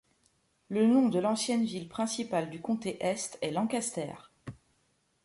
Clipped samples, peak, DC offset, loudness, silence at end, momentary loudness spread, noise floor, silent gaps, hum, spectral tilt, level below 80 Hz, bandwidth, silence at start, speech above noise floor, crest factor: under 0.1%; -16 dBFS; under 0.1%; -31 LUFS; 0.7 s; 16 LU; -73 dBFS; none; none; -4.5 dB/octave; -70 dBFS; 11.5 kHz; 0.7 s; 43 dB; 16 dB